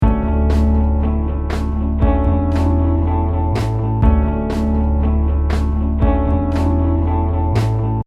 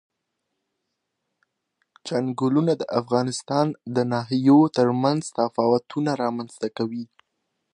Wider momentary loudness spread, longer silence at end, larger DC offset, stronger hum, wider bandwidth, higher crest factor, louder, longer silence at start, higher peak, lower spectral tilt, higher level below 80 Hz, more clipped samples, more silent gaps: second, 4 LU vs 12 LU; second, 0.05 s vs 0.7 s; neither; neither; second, 6.2 kHz vs 10.5 kHz; about the same, 14 dB vs 18 dB; first, -17 LUFS vs -23 LUFS; second, 0 s vs 2.05 s; first, -2 dBFS vs -6 dBFS; first, -9 dB/octave vs -6.5 dB/octave; first, -18 dBFS vs -70 dBFS; neither; neither